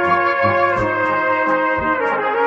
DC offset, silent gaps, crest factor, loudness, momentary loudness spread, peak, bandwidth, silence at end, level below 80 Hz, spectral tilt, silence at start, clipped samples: under 0.1%; none; 14 dB; -17 LUFS; 2 LU; -2 dBFS; 7.8 kHz; 0 s; -46 dBFS; -7 dB/octave; 0 s; under 0.1%